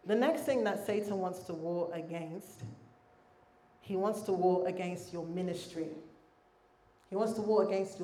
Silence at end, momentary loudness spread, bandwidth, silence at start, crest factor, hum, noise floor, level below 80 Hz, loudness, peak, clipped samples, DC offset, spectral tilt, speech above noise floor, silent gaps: 0 s; 13 LU; 15.5 kHz; 0.05 s; 20 dB; none; -66 dBFS; -76 dBFS; -35 LUFS; -16 dBFS; under 0.1%; under 0.1%; -6 dB/octave; 33 dB; none